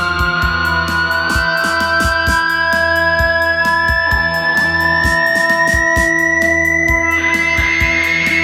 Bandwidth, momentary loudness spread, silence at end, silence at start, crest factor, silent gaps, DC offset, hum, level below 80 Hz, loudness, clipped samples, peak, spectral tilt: 18 kHz; 3 LU; 0 s; 0 s; 12 dB; none; under 0.1%; none; -28 dBFS; -12 LUFS; under 0.1%; -2 dBFS; -4 dB/octave